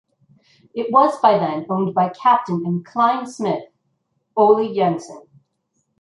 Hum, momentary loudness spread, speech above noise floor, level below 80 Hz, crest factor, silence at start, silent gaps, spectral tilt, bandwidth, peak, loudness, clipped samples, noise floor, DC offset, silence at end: none; 12 LU; 53 dB; -70 dBFS; 18 dB; 0.75 s; none; -7 dB/octave; 11 kHz; -2 dBFS; -18 LUFS; under 0.1%; -70 dBFS; under 0.1%; 0.8 s